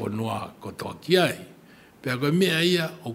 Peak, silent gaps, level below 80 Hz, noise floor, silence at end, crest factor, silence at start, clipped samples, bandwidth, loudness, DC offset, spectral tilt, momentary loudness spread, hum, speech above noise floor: -6 dBFS; none; -64 dBFS; -51 dBFS; 0 s; 20 dB; 0 s; under 0.1%; 16 kHz; -24 LUFS; under 0.1%; -5 dB/octave; 15 LU; none; 26 dB